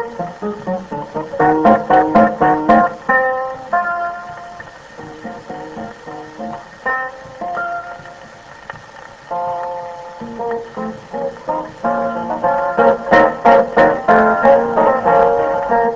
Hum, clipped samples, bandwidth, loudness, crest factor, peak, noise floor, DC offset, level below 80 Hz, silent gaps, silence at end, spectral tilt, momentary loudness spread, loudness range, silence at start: none; under 0.1%; 7.8 kHz; -15 LUFS; 16 dB; 0 dBFS; -37 dBFS; under 0.1%; -46 dBFS; none; 0 s; -7 dB/octave; 20 LU; 14 LU; 0 s